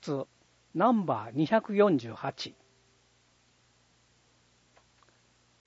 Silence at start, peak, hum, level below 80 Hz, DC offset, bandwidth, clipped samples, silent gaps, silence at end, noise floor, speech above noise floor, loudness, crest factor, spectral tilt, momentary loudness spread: 0 s; -12 dBFS; 60 Hz at -65 dBFS; -76 dBFS; under 0.1%; 8 kHz; under 0.1%; none; 3.15 s; -67 dBFS; 39 dB; -29 LUFS; 20 dB; -7 dB/octave; 15 LU